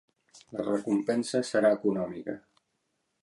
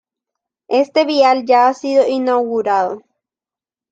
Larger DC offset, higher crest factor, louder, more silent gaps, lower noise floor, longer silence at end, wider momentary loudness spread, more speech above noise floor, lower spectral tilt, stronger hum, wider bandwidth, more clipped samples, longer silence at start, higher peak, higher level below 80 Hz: neither; about the same, 18 dB vs 14 dB; second, -29 LUFS vs -15 LUFS; neither; second, -78 dBFS vs under -90 dBFS; about the same, 0.85 s vs 0.95 s; first, 15 LU vs 6 LU; second, 50 dB vs over 76 dB; first, -5.5 dB/octave vs -4 dB/octave; neither; first, 11.5 kHz vs 7.8 kHz; neither; second, 0.35 s vs 0.7 s; second, -12 dBFS vs -2 dBFS; about the same, -72 dBFS vs -70 dBFS